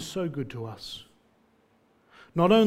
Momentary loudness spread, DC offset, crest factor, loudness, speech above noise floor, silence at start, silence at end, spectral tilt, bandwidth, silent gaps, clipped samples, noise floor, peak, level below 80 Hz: 16 LU; under 0.1%; 20 dB; -30 LUFS; 40 dB; 0 s; 0 s; -6 dB/octave; 15 kHz; none; under 0.1%; -65 dBFS; -8 dBFS; -62 dBFS